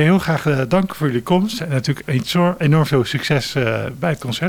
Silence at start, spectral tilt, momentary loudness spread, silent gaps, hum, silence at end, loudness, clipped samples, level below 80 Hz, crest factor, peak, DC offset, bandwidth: 0 s; -6.5 dB/octave; 6 LU; none; none; 0 s; -18 LUFS; under 0.1%; -48 dBFS; 16 dB; -2 dBFS; under 0.1%; 17.5 kHz